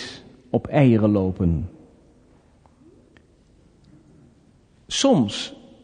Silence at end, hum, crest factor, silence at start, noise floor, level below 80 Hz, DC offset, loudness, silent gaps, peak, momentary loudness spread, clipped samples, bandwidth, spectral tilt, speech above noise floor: 0.3 s; none; 20 dB; 0 s; -56 dBFS; -42 dBFS; under 0.1%; -21 LUFS; none; -4 dBFS; 18 LU; under 0.1%; 10 kHz; -6 dB/octave; 37 dB